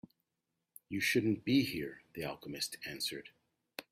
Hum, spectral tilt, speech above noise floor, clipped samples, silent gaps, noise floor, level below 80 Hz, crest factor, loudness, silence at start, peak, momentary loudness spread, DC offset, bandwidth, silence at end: none; -4 dB/octave; 51 dB; under 0.1%; none; -87 dBFS; -72 dBFS; 20 dB; -36 LUFS; 0.9 s; -18 dBFS; 15 LU; under 0.1%; 16 kHz; 0.1 s